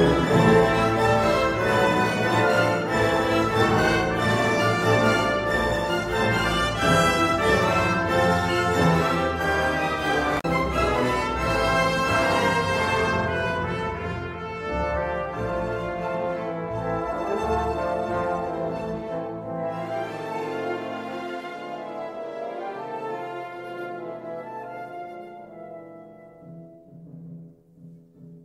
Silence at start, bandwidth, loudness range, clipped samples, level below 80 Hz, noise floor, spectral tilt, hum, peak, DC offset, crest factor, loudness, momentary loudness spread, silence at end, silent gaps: 0 s; 16 kHz; 14 LU; under 0.1%; -42 dBFS; -48 dBFS; -5.5 dB/octave; none; -6 dBFS; under 0.1%; 18 dB; -23 LUFS; 14 LU; 0.05 s; none